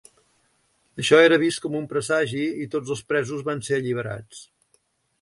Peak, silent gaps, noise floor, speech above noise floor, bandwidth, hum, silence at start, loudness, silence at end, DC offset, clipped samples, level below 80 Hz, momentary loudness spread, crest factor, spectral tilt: -4 dBFS; none; -67 dBFS; 44 dB; 11.5 kHz; none; 0.95 s; -22 LUFS; 0.8 s; under 0.1%; under 0.1%; -64 dBFS; 15 LU; 20 dB; -4.5 dB/octave